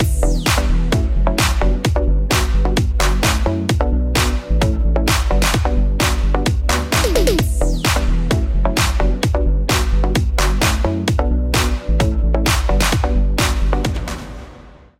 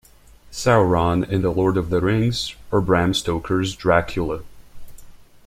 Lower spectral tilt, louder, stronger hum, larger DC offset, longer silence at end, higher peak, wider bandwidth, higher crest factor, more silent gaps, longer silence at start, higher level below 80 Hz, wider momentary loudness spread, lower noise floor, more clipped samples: second, -4.5 dB/octave vs -6 dB/octave; first, -17 LUFS vs -20 LUFS; neither; neither; about the same, 0.3 s vs 0.3 s; about the same, -4 dBFS vs -2 dBFS; about the same, 16.5 kHz vs 15.5 kHz; second, 12 dB vs 20 dB; neither; second, 0 s vs 0.5 s; first, -18 dBFS vs -40 dBFS; second, 2 LU vs 9 LU; second, -40 dBFS vs -48 dBFS; neither